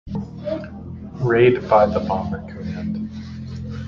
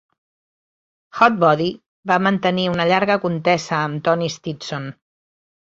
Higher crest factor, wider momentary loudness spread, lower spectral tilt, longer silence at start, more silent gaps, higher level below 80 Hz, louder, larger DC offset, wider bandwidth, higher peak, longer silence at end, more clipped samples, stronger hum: about the same, 20 dB vs 18 dB; first, 17 LU vs 12 LU; first, -8.5 dB/octave vs -5.5 dB/octave; second, 0.05 s vs 1.15 s; second, none vs 1.88-2.03 s; first, -40 dBFS vs -60 dBFS; about the same, -21 LUFS vs -19 LUFS; neither; second, 7 kHz vs 7.8 kHz; about the same, -2 dBFS vs -2 dBFS; second, 0 s vs 0.85 s; neither; neither